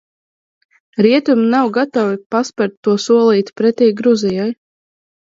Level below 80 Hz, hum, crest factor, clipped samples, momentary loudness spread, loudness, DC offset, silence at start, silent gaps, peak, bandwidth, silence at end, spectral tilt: -64 dBFS; none; 14 dB; under 0.1%; 8 LU; -14 LUFS; under 0.1%; 0.95 s; 2.26-2.30 s, 2.77-2.83 s; 0 dBFS; 7.8 kHz; 0.85 s; -6 dB/octave